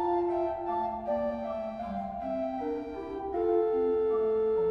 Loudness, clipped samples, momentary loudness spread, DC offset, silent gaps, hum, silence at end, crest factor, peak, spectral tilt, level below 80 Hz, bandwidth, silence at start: -31 LUFS; under 0.1%; 8 LU; under 0.1%; none; none; 0 s; 14 dB; -16 dBFS; -8.5 dB/octave; -56 dBFS; 5.6 kHz; 0 s